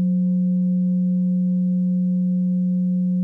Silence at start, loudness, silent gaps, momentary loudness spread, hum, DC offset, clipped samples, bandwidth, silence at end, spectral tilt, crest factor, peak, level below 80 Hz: 0 s; -21 LUFS; none; 1 LU; none; under 0.1%; under 0.1%; 0.6 kHz; 0 s; -14 dB/octave; 4 dB; -16 dBFS; -84 dBFS